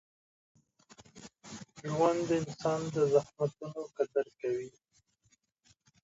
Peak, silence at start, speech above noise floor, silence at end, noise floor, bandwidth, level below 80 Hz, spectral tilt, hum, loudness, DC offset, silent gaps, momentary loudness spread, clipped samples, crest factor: -14 dBFS; 1.15 s; 41 dB; 1.35 s; -73 dBFS; 8 kHz; -72 dBFS; -6 dB/octave; none; -33 LUFS; under 0.1%; none; 20 LU; under 0.1%; 20 dB